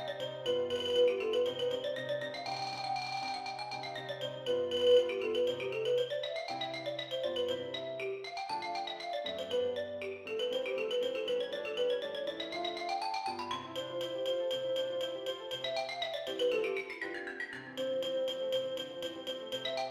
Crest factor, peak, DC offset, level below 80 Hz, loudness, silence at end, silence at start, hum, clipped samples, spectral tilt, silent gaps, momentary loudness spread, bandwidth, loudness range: 18 dB; -16 dBFS; under 0.1%; -76 dBFS; -35 LUFS; 0 s; 0 s; none; under 0.1%; -3.5 dB/octave; none; 7 LU; 13 kHz; 4 LU